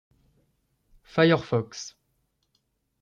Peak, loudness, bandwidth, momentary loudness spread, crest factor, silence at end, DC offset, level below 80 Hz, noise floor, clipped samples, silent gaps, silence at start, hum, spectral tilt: -8 dBFS; -24 LUFS; 7.4 kHz; 18 LU; 22 dB; 1.15 s; under 0.1%; -64 dBFS; -74 dBFS; under 0.1%; none; 1.15 s; none; -6 dB/octave